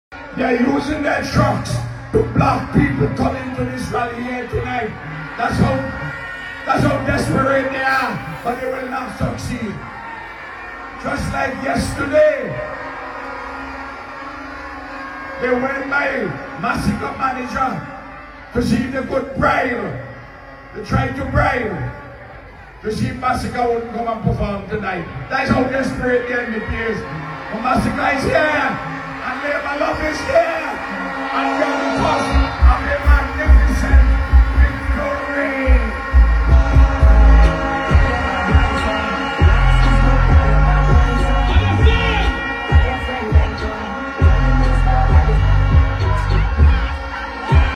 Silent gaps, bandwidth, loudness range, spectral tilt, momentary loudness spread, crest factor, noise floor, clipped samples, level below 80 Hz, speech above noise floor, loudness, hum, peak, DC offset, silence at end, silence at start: none; 11.5 kHz; 7 LU; -7 dB/octave; 14 LU; 16 dB; -37 dBFS; under 0.1%; -20 dBFS; 19 dB; -18 LUFS; none; -2 dBFS; under 0.1%; 0 s; 0.1 s